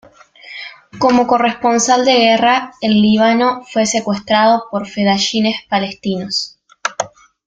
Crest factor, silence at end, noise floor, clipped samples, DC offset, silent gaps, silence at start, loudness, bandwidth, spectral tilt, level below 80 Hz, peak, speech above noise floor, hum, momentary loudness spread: 14 dB; 0.4 s; -40 dBFS; under 0.1%; under 0.1%; none; 0.45 s; -14 LUFS; 9.4 kHz; -3.5 dB/octave; -54 dBFS; 0 dBFS; 26 dB; none; 14 LU